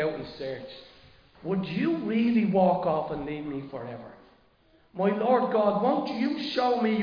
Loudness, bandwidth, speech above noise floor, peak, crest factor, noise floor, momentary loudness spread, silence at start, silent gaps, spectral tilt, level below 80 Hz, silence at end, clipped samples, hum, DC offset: -27 LUFS; 5.2 kHz; 35 dB; -10 dBFS; 18 dB; -62 dBFS; 17 LU; 0 s; none; -8 dB/octave; -60 dBFS; 0 s; under 0.1%; none; under 0.1%